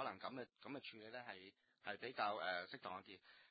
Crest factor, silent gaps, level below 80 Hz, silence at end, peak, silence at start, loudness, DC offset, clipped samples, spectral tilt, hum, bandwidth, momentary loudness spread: 22 dB; none; -88 dBFS; 0.05 s; -28 dBFS; 0 s; -49 LUFS; under 0.1%; under 0.1%; -1 dB/octave; none; 4.9 kHz; 14 LU